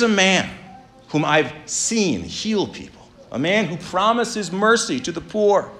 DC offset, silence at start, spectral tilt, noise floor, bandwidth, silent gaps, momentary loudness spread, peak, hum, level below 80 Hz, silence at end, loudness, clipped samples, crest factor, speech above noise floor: under 0.1%; 0 s; -3.5 dB/octave; -43 dBFS; 13 kHz; none; 10 LU; -2 dBFS; none; -54 dBFS; 0 s; -20 LUFS; under 0.1%; 18 dB; 24 dB